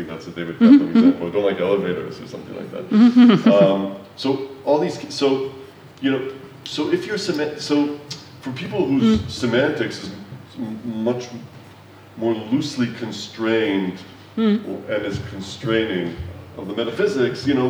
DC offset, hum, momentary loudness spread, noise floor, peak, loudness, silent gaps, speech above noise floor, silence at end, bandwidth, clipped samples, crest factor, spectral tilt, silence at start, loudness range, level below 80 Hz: under 0.1%; none; 18 LU; -44 dBFS; -2 dBFS; -20 LUFS; none; 24 dB; 0 s; over 20 kHz; under 0.1%; 18 dB; -6 dB/octave; 0 s; 8 LU; -52 dBFS